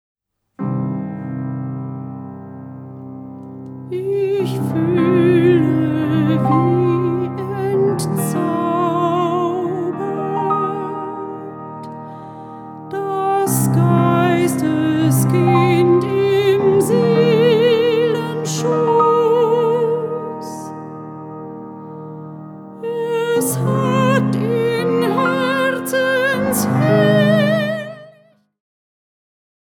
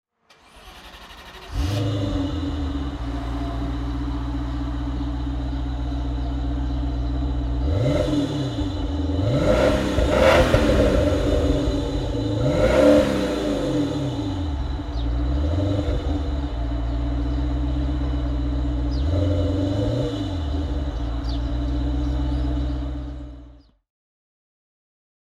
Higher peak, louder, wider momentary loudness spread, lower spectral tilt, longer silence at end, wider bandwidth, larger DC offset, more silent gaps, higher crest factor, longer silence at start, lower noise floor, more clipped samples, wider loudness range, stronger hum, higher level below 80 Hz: about the same, -2 dBFS vs -2 dBFS; first, -17 LUFS vs -23 LUFS; first, 19 LU vs 10 LU; about the same, -6.5 dB/octave vs -7 dB/octave; about the same, 1.65 s vs 1.75 s; first, 18.5 kHz vs 12 kHz; neither; neither; about the same, 16 dB vs 20 dB; about the same, 0.6 s vs 0.55 s; about the same, -53 dBFS vs -54 dBFS; neither; about the same, 10 LU vs 8 LU; neither; second, -60 dBFS vs -26 dBFS